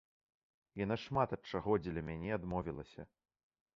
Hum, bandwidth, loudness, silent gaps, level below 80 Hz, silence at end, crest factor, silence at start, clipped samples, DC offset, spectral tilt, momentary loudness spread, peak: none; 7.4 kHz; -39 LUFS; none; -60 dBFS; 0.7 s; 22 dB; 0.75 s; under 0.1%; under 0.1%; -6 dB/octave; 17 LU; -18 dBFS